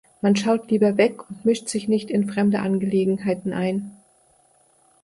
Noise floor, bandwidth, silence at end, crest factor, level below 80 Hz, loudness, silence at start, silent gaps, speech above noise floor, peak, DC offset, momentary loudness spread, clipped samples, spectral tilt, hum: -59 dBFS; 11.5 kHz; 1.1 s; 16 dB; -64 dBFS; -22 LUFS; 0.25 s; none; 38 dB; -6 dBFS; under 0.1%; 6 LU; under 0.1%; -6 dB/octave; none